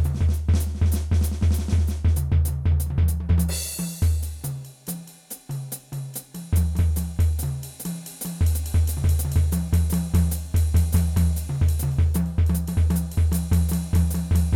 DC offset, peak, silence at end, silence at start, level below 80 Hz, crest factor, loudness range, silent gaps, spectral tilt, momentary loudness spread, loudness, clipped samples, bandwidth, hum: under 0.1%; -8 dBFS; 0 s; 0 s; -28 dBFS; 12 dB; 5 LU; none; -6 dB/octave; 11 LU; -24 LUFS; under 0.1%; 17 kHz; none